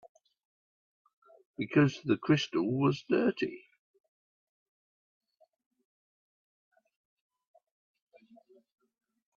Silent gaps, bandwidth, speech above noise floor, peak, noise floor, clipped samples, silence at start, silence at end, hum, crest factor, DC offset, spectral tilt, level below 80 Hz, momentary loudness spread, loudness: none; 7.4 kHz; 33 dB; -14 dBFS; -62 dBFS; under 0.1%; 1.6 s; 5.8 s; none; 22 dB; under 0.1%; -7 dB/octave; -76 dBFS; 12 LU; -30 LUFS